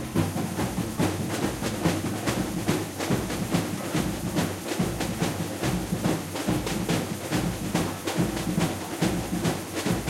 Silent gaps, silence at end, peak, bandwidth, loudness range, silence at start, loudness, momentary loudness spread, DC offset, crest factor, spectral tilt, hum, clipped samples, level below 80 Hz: none; 0 s; -10 dBFS; 16 kHz; 1 LU; 0 s; -28 LUFS; 2 LU; under 0.1%; 18 dB; -5 dB/octave; none; under 0.1%; -44 dBFS